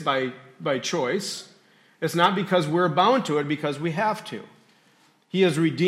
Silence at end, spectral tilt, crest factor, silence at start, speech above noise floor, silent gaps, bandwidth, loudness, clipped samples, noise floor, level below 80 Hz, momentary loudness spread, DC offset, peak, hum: 0 s; -5 dB/octave; 18 dB; 0 s; 37 dB; none; 15 kHz; -24 LUFS; under 0.1%; -60 dBFS; -74 dBFS; 12 LU; under 0.1%; -6 dBFS; none